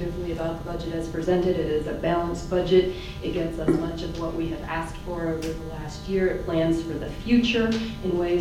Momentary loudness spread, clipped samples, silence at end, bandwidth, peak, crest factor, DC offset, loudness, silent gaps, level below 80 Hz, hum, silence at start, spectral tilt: 10 LU; under 0.1%; 0 s; 15 kHz; -6 dBFS; 18 dB; under 0.1%; -26 LUFS; none; -38 dBFS; none; 0 s; -6.5 dB/octave